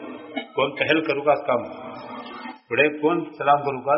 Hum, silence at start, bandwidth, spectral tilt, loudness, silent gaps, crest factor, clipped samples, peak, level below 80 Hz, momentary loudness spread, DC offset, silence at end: none; 0 s; 5.8 kHz; -2.5 dB/octave; -22 LUFS; none; 18 dB; under 0.1%; -4 dBFS; -66 dBFS; 16 LU; under 0.1%; 0 s